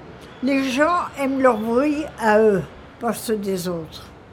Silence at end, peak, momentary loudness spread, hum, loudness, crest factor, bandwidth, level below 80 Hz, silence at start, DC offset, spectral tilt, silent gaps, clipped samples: 0 s; -2 dBFS; 15 LU; none; -21 LUFS; 18 dB; 17.5 kHz; -50 dBFS; 0 s; under 0.1%; -5.5 dB/octave; none; under 0.1%